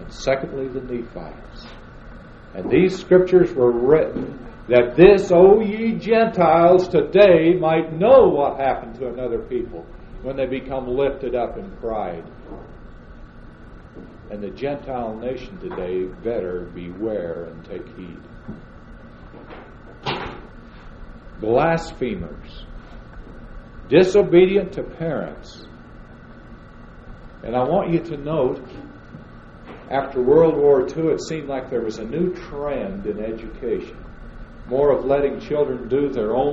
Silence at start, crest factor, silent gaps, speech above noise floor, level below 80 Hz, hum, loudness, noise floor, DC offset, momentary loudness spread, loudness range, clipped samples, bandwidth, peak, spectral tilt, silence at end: 0 s; 20 dB; none; 22 dB; -42 dBFS; none; -19 LUFS; -41 dBFS; under 0.1%; 25 LU; 17 LU; under 0.1%; 7.8 kHz; 0 dBFS; -7.5 dB/octave; 0 s